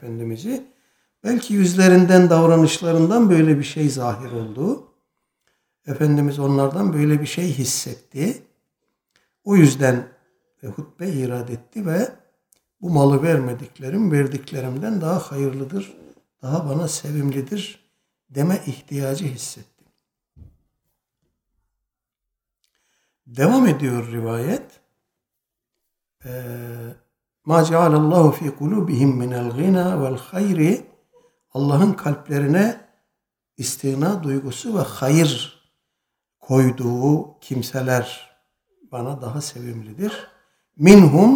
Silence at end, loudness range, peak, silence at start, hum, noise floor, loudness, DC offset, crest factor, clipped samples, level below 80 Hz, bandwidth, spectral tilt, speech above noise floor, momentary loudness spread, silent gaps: 0 s; 11 LU; 0 dBFS; 0 s; none; -83 dBFS; -19 LUFS; under 0.1%; 20 dB; under 0.1%; -58 dBFS; 18.5 kHz; -6.5 dB/octave; 65 dB; 18 LU; none